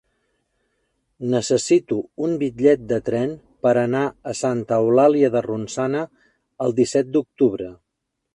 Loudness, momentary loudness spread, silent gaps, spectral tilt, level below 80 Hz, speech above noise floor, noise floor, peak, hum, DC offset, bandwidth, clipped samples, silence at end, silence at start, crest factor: -20 LUFS; 10 LU; none; -6 dB/octave; -58 dBFS; 51 dB; -71 dBFS; -4 dBFS; none; under 0.1%; 11 kHz; under 0.1%; 0.6 s; 1.2 s; 18 dB